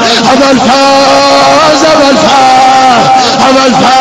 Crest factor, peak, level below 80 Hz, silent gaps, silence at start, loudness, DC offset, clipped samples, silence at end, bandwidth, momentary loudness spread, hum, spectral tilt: 4 dB; 0 dBFS; -38 dBFS; none; 0 s; -4 LUFS; 0.8%; 2%; 0 s; 13 kHz; 2 LU; none; -3 dB/octave